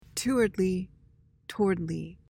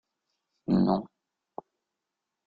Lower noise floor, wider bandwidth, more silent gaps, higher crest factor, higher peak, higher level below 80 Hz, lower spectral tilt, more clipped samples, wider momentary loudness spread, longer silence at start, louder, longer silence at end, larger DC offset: second, -61 dBFS vs -86 dBFS; first, 17 kHz vs 4.9 kHz; neither; about the same, 16 dB vs 20 dB; about the same, -14 dBFS vs -12 dBFS; first, -54 dBFS vs -62 dBFS; second, -5.5 dB/octave vs -10.5 dB/octave; neither; second, 16 LU vs 22 LU; second, 0.15 s vs 0.7 s; about the same, -29 LUFS vs -27 LUFS; second, 0.15 s vs 1.4 s; neither